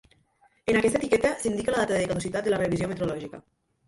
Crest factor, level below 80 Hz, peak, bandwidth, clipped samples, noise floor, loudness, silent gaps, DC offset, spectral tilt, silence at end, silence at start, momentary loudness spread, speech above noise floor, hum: 16 dB; -52 dBFS; -10 dBFS; 11.5 kHz; under 0.1%; -64 dBFS; -26 LUFS; none; under 0.1%; -5 dB/octave; 0.5 s; 0.65 s; 8 LU; 39 dB; none